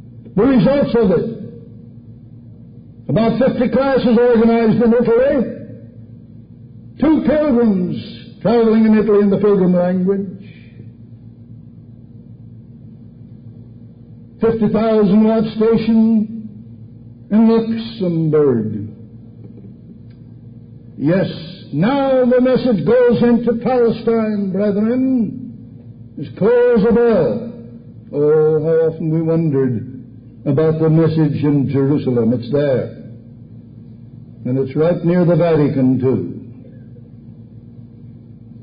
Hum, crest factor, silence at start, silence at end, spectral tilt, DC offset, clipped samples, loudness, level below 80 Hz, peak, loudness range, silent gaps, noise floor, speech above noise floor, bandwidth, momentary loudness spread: none; 12 dB; 0.05 s; 0 s; -13.5 dB/octave; under 0.1%; under 0.1%; -15 LUFS; -46 dBFS; -4 dBFS; 6 LU; none; -39 dBFS; 25 dB; 5.2 kHz; 19 LU